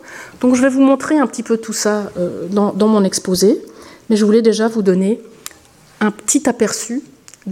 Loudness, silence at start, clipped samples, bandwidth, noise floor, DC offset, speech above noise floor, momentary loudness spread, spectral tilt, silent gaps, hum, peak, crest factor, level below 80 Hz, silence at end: -15 LUFS; 0.05 s; under 0.1%; 16 kHz; -45 dBFS; under 0.1%; 31 dB; 12 LU; -4.5 dB/octave; none; none; -2 dBFS; 14 dB; -56 dBFS; 0 s